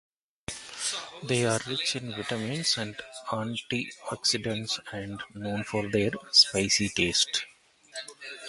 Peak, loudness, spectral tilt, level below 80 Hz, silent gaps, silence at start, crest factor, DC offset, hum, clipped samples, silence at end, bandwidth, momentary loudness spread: -6 dBFS; -27 LUFS; -2.5 dB/octave; -58 dBFS; none; 0.5 s; 24 dB; under 0.1%; none; under 0.1%; 0 s; 11.5 kHz; 18 LU